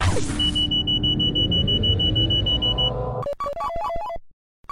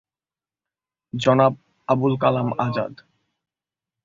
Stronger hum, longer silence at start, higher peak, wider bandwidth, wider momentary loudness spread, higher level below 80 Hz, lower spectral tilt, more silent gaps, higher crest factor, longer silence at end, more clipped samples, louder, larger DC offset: neither; second, 0 s vs 1.15 s; second, -8 dBFS vs -4 dBFS; first, 11.5 kHz vs 7.6 kHz; second, 9 LU vs 15 LU; first, -32 dBFS vs -60 dBFS; second, -5 dB/octave vs -7.5 dB/octave; neither; second, 14 dB vs 20 dB; second, 0.4 s vs 1.1 s; neither; about the same, -21 LUFS vs -21 LUFS; neither